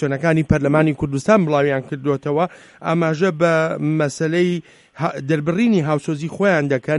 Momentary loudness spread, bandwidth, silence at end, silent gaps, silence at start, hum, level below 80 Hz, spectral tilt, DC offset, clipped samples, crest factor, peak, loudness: 7 LU; 11.5 kHz; 0 s; none; 0 s; none; -46 dBFS; -7 dB/octave; under 0.1%; under 0.1%; 18 dB; 0 dBFS; -19 LUFS